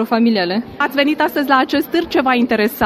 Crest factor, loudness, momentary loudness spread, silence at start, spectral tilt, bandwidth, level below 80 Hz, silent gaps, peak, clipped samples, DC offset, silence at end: 14 dB; -16 LUFS; 4 LU; 0 s; -5 dB/octave; 15.5 kHz; -52 dBFS; none; 0 dBFS; under 0.1%; under 0.1%; 0 s